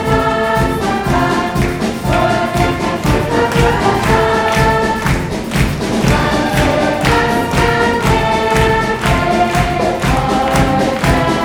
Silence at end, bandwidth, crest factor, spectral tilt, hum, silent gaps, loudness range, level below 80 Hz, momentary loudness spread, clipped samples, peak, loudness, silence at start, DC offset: 0 s; over 20 kHz; 14 dB; -5.5 dB/octave; none; none; 1 LU; -24 dBFS; 4 LU; under 0.1%; 0 dBFS; -14 LUFS; 0 s; under 0.1%